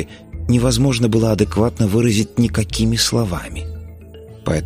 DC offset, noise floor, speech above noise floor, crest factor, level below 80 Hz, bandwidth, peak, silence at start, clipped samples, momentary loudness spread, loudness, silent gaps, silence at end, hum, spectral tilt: under 0.1%; -37 dBFS; 21 dB; 16 dB; -32 dBFS; 15.5 kHz; -2 dBFS; 0 s; under 0.1%; 14 LU; -17 LUFS; none; 0 s; none; -5.5 dB/octave